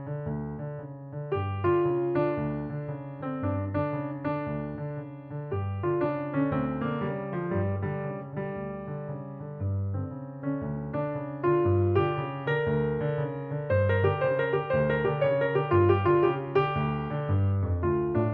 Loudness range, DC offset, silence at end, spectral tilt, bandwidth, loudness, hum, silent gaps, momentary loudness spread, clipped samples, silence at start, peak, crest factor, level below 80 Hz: 8 LU; under 0.1%; 0 s; -11 dB/octave; 4.6 kHz; -29 LUFS; none; none; 12 LU; under 0.1%; 0 s; -10 dBFS; 18 dB; -52 dBFS